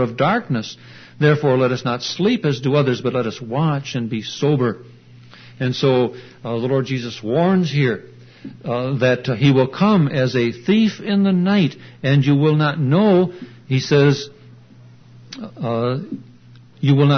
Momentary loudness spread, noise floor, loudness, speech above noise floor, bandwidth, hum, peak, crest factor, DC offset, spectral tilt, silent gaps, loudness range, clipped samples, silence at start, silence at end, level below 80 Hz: 12 LU; -45 dBFS; -18 LUFS; 27 dB; 6.6 kHz; none; -2 dBFS; 16 dB; under 0.1%; -7 dB/octave; none; 5 LU; under 0.1%; 0 s; 0 s; -58 dBFS